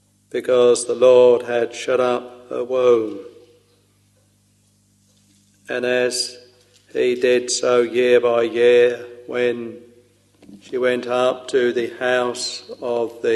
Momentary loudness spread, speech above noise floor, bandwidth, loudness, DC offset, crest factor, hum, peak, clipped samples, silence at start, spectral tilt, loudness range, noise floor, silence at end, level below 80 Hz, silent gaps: 15 LU; 41 dB; 12 kHz; -18 LUFS; under 0.1%; 18 dB; 50 Hz at -60 dBFS; -2 dBFS; under 0.1%; 0.35 s; -3 dB/octave; 9 LU; -59 dBFS; 0 s; -68 dBFS; none